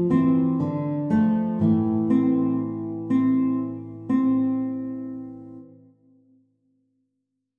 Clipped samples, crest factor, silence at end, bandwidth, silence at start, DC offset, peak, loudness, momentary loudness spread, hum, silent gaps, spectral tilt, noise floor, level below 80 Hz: under 0.1%; 14 dB; 1.95 s; 3.9 kHz; 0 s; under 0.1%; -10 dBFS; -23 LUFS; 14 LU; none; none; -11 dB/octave; -78 dBFS; -60 dBFS